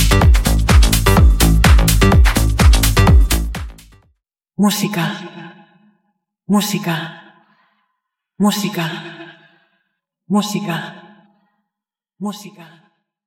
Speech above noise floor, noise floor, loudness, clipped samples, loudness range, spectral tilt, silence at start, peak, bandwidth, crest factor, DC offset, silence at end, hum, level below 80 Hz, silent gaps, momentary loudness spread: 67 dB; -86 dBFS; -15 LUFS; under 0.1%; 13 LU; -5 dB/octave; 0 s; 0 dBFS; 17 kHz; 16 dB; under 0.1%; 0.8 s; none; -18 dBFS; none; 19 LU